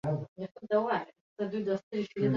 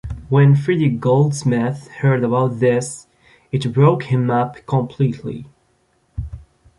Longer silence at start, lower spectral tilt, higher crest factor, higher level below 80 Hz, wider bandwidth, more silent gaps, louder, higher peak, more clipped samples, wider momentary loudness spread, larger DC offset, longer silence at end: about the same, 0.05 s vs 0.05 s; about the same, -8.5 dB/octave vs -7.5 dB/octave; about the same, 16 dB vs 16 dB; second, -70 dBFS vs -42 dBFS; second, 7.2 kHz vs 11.5 kHz; first, 0.28-0.36 s, 0.51-0.55 s, 1.21-1.36 s, 1.83-1.91 s vs none; second, -33 LUFS vs -17 LUFS; second, -16 dBFS vs -2 dBFS; neither; second, 13 LU vs 17 LU; neither; second, 0 s vs 0.4 s